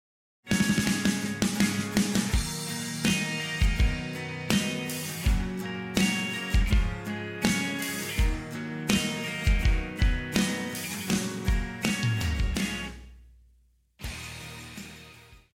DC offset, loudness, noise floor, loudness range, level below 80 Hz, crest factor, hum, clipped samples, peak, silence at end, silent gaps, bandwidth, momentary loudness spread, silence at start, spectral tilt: under 0.1%; -28 LUFS; -64 dBFS; 4 LU; -32 dBFS; 22 dB; none; under 0.1%; -6 dBFS; 0.15 s; none; 16.5 kHz; 12 LU; 0.45 s; -4 dB/octave